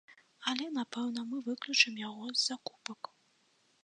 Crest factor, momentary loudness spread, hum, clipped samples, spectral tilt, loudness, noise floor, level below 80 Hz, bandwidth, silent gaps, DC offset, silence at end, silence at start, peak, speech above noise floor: 26 dB; 17 LU; none; under 0.1%; -1 dB/octave; -33 LUFS; -72 dBFS; -90 dBFS; 10.5 kHz; none; under 0.1%; 0.9 s; 0.1 s; -10 dBFS; 37 dB